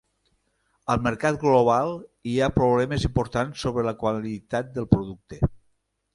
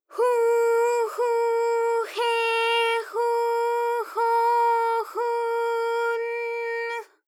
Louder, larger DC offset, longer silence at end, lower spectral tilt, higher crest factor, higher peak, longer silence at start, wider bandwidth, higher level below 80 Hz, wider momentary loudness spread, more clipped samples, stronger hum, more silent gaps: about the same, -24 LUFS vs -24 LUFS; neither; first, 0.6 s vs 0.25 s; first, -7 dB/octave vs 2 dB/octave; first, 24 dB vs 12 dB; first, 0 dBFS vs -12 dBFS; first, 0.9 s vs 0.1 s; second, 11.5 kHz vs 15 kHz; first, -42 dBFS vs under -90 dBFS; first, 10 LU vs 7 LU; neither; neither; neither